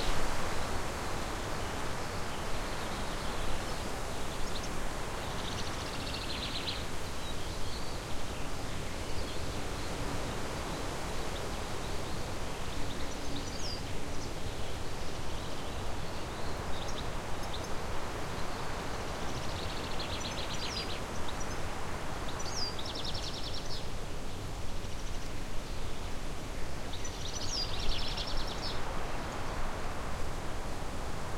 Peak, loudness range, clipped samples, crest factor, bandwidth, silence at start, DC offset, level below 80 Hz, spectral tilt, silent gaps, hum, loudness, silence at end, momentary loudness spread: -16 dBFS; 2 LU; under 0.1%; 16 dB; 15.5 kHz; 0 s; under 0.1%; -40 dBFS; -4 dB/octave; none; none; -38 LUFS; 0 s; 5 LU